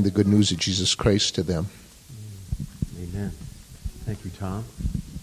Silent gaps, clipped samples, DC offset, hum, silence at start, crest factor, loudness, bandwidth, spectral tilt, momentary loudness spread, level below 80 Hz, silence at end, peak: none; under 0.1%; under 0.1%; none; 0 s; 20 dB; -25 LUFS; 15 kHz; -5 dB/octave; 21 LU; -38 dBFS; 0 s; -6 dBFS